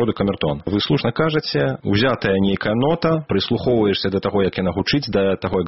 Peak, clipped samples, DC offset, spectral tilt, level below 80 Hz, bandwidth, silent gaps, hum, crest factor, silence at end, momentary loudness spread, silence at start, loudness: -4 dBFS; under 0.1%; 0.2%; -5 dB/octave; -44 dBFS; 6 kHz; none; none; 14 dB; 0 s; 3 LU; 0 s; -19 LUFS